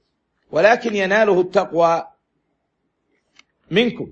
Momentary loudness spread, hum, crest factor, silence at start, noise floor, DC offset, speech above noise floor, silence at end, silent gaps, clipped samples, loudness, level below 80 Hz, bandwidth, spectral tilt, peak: 6 LU; none; 18 dB; 0.55 s; -72 dBFS; under 0.1%; 55 dB; 0 s; none; under 0.1%; -17 LUFS; -62 dBFS; 7.8 kHz; -5.5 dB/octave; -2 dBFS